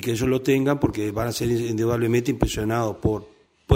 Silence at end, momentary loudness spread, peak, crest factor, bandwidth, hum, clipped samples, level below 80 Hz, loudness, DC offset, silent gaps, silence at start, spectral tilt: 0 s; 5 LU; -4 dBFS; 20 dB; 16 kHz; none; under 0.1%; -40 dBFS; -23 LUFS; under 0.1%; none; 0 s; -6 dB/octave